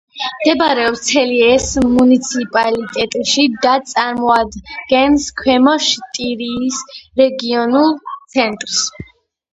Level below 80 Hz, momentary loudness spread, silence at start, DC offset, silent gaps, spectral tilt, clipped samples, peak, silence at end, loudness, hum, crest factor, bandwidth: -42 dBFS; 9 LU; 0.15 s; under 0.1%; none; -2.5 dB/octave; under 0.1%; 0 dBFS; 0.5 s; -14 LUFS; none; 14 dB; 8.6 kHz